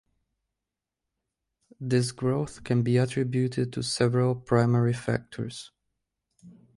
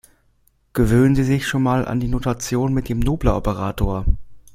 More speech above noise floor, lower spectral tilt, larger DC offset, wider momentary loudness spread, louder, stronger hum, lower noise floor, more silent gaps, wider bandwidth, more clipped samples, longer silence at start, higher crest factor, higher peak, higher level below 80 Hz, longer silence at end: first, 62 dB vs 42 dB; about the same, -6.5 dB/octave vs -6.5 dB/octave; neither; first, 12 LU vs 8 LU; second, -27 LUFS vs -20 LUFS; neither; first, -88 dBFS vs -60 dBFS; neither; second, 11.5 kHz vs 16 kHz; neither; first, 1.8 s vs 0.75 s; about the same, 18 dB vs 16 dB; second, -10 dBFS vs -2 dBFS; second, -60 dBFS vs -28 dBFS; about the same, 0.25 s vs 0.15 s